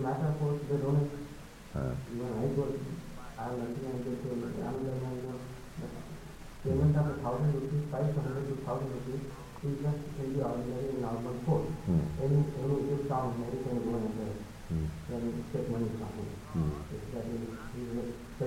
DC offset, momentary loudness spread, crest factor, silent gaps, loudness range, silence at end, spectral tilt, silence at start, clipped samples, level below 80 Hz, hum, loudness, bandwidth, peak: under 0.1%; 12 LU; 16 dB; none; 5 LU; 0 s; -8.5 dB/octave; 0 s; under 0.1%; -50 dBFS; none; -35 LUFS; 15.5 kHz; -18 dBFS